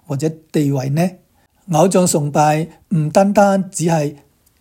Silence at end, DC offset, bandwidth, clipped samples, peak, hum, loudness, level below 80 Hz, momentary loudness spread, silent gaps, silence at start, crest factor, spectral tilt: 0.45 s; under 0.1%; 16.5 kHz; under 0.1%; 0 dBFS; none; -16 LUFS; -56 dBFS; 9 LU; none; 0.1 s; 16 dB; -6 dB/octave